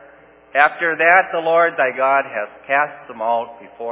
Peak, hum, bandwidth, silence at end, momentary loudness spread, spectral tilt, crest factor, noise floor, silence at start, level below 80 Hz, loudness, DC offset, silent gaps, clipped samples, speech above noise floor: 0 dBFS; none; 4 kHz; 0 s; 13 LU; -7 dB/octave; 18 dB; -47 dBFS; 0.55 s; -70 dBFS; -17 LUFS; under 0.1%; none; under 0.1%; 29 dB